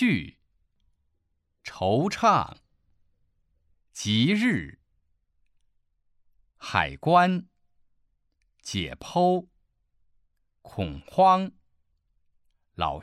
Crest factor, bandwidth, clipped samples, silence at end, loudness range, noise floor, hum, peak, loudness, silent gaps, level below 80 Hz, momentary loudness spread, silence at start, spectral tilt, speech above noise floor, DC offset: 24 dB; 13 kHz; under 0.1%; 0 s; 3 LU; -74 dBFS; none; -4 dBFS; -25 LUFS; none; -54 dBFS; 22 LU; 0 s; -5.5 dB/octave; 50 dB; under 0.1%